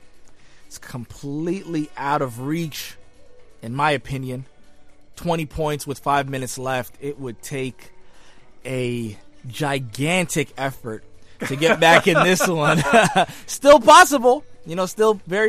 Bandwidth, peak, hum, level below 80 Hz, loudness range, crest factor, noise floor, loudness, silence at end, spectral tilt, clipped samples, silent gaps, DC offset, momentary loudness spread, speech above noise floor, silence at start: 15.5 kHz; 0 dBFS; none; -50 dBFS; 13 LU; 20 dB; -42 dBFS; -19 LUFS; 0 s; -4 dB/octave; under 0.1%; none; under 0.1%; 21 LU; 23 dB; 0 s